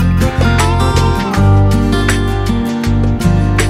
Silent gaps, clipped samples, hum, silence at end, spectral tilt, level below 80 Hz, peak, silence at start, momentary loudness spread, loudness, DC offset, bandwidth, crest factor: none; under 0.1%; none; 0 s; -6 dB/octave; -18 dBFS; 0 dBFS; 0 s; 5 LU; -13 LUFS; under 0.1%; 14.5 kHz; 10 dB